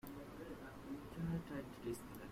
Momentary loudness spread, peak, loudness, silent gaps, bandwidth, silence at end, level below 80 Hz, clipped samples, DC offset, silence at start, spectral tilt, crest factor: 8 LU; -32 dBFS; -48 LUFS; none; 16 kHz; 0 s; -62 dBFS; under 0.1%; under 0.1%; 0.05 s; -6.5 dB/octave; 16 dB